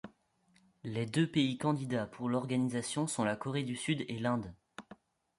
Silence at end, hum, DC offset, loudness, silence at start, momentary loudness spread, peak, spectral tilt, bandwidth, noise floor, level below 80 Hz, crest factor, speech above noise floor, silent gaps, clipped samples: 0.45 s; none; under 0.1%; -34 LUFS; 0.05 s; 17 LU; -18 dBFS; -5.5 dB/octave; 11.5 kHz; -71 dBFS; -68 dBFS; 18 dB; 37 dB; none; under 0.1%